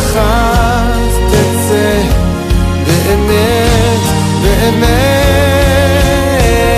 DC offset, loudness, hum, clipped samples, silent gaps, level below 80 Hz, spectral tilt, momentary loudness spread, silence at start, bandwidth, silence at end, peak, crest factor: under 0.1%; -10 LUFS; none; under 0.1%; none; -16 dBFS; -5 dB/octave; 3 LU; 0 s; 15.5 kHz; 0 s; 0 dBFS; 10 dB